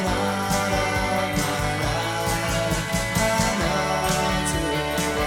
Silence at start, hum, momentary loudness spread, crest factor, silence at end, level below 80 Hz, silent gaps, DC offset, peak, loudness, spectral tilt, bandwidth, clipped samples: 0 s; none; 2 LU; 16 dB; 0 s; -36 dBFS; none; under 0.1%; -8 dBFS; -23 LUFS; -4 dB/octave; 19 kHz; under 0.1%